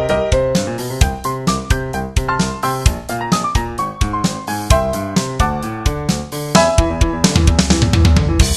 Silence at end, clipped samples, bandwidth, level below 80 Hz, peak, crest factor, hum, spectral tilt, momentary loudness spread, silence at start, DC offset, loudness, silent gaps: 0 s; under 0.1%; 14 kHz; -20 dBFS; 0 dBFS; 16 dB; none; -5 dB/octave; 8 LU; 0 s; under 0.1%; -17 LUFS; none